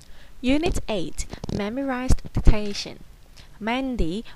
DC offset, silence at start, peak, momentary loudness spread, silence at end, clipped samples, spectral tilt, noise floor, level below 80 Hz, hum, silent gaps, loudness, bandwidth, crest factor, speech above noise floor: under 0.1%; 0.1 s; 0 dBFS; 10 LU; 0 s; under 0.1%; -5.5 dB/octave; -45 dBFS; -28 dBFS; none; none; -27 LUFS; 12 kHz; 22 dB; 24 dB